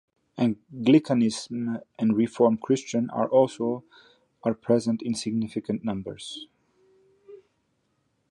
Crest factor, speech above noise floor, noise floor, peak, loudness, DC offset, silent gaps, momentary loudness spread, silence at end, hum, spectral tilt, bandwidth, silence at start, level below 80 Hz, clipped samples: 20 dB; 48 dB; -72 dBFS; -6 dBFS; -26 LUFS; under 0.1%; none; 13 LU; 0.95 s; none; -6 dB/octave; 11 kHz; 0.35 s; -66 dBFS; under 0.1%